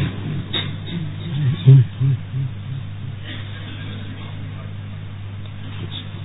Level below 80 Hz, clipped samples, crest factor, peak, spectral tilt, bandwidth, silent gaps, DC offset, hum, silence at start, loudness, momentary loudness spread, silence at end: -46 dBFS; under 0.1%; 20 dB; -2 dBFS; -6.5 dB/octave; 4 kHz; none; 0.6%; none; 0 s; -22 LUFS; 19 LU; 0 s